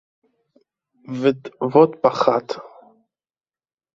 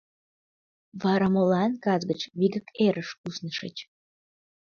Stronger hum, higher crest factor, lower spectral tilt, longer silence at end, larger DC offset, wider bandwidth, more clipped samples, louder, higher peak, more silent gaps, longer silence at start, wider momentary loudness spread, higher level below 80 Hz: neither; about the same, 20 dB vs 18 dB; about the same, -7 dB/octave vs -6.5 dB/octave; first, 1.25 s vs 0.85 s; neither; about the same, 7.4 kHz vs 6.8 kHz; neither; first, -19 LUFS vs -26 LUFS; first, -2 dBFS vs -10 dBFS; second, none vs 3.18-3.24 s; first, 1.1 s vs 0.95 s; first, 17 LU vs 13 LU; about the same, -66 dBFS vs -68 dBFS